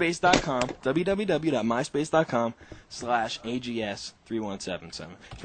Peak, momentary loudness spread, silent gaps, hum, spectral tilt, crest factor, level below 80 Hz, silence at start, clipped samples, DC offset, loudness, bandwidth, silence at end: -4 dBFS; 14 LU; none; none; -4.5 dB/octave; 24 dB; -52 dBFS; 0 s; under 0.1%; under 0.1%; -28 LUFS; 9.2 kHz; 0 s